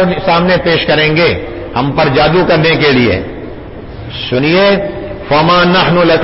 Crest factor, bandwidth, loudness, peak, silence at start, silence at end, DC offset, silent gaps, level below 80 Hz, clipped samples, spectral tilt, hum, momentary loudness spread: 10 dB; 5.8 kHz; -10 LUFS; 0 dBFS; 0 s; 0 s; under 0.1%; none; -32 dBFS; under 0.1%; -9.5 dB/octave; none; 16 LU